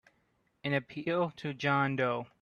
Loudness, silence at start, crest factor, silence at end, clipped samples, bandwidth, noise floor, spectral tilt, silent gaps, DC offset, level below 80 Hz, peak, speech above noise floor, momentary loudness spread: -32 LUFS; 0.65 s; 18 dB; 0.15 s; under 0.1%; 7 kHz; -74 dBFS; -7 dB/octave; none; under 0.1%; -72 dBFS; -14 dBFS; 42 dB; 6 LU